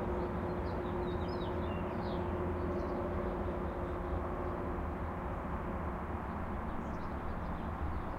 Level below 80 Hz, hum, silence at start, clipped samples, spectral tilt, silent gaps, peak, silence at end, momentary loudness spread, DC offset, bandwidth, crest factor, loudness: -44 dBFS; none; 0 s; under 0.1%; -8.5 dB/octave; none; -24 dBFS; 0 s; 3 LU; under 0.1%; 10 kHz; 12 dB; -39 LUFS